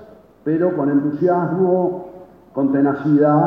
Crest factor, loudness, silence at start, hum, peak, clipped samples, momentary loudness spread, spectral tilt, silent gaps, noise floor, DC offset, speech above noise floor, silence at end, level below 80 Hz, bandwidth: 12 dB; -18 LUFS; 0 s; none; -4 dBFS; under 0.1%; 13 LU; -11.5 dB/octave; none; -40 dBFS; under 0.1%; 24 dB; 0 s; -60 dBFS; 3.7 kHz